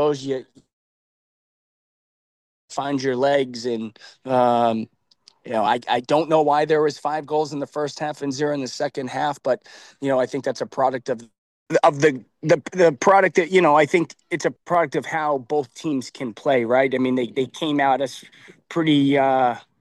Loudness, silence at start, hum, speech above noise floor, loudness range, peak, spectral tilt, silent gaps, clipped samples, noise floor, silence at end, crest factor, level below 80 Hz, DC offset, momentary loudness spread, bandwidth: -21 LUFS; 0 s; none; 35 dB; 7 LU; -4 dBFS; -5.5 dB/octave; 0.73-2.68 s, 11.38-11.66 s; under 0.1%; -56 dBFS; 0.2 s; 18 dB; -72 dBFS; under 0.1%; 11 LU; 12 kHz